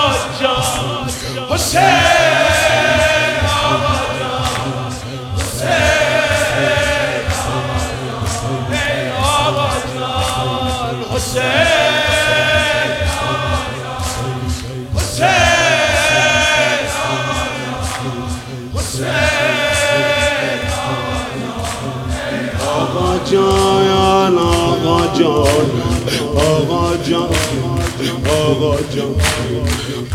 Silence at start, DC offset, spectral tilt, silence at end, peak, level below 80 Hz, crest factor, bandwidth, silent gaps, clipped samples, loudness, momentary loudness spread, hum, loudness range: 0 s; under 0.1%; -4 dB/octave; 0 s; 0 dBFS; -32 dBFS; 16 dB; 16.5 kHz; none; under 0.1%; -15 LUFS; 10 LU; none; 4 LU